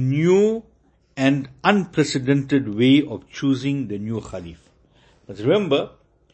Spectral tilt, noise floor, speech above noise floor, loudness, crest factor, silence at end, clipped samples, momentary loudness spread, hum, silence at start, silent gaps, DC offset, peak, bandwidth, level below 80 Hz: -6.5 dB/octave; -56 dBFS; 36 dB; -20 LUFS; 20 dB; 0.45 s; under 0.1%; 18 LU; none; 0 s; none; under 0.1%; -2 dBFS; 8.6 kHz; -54 dBFS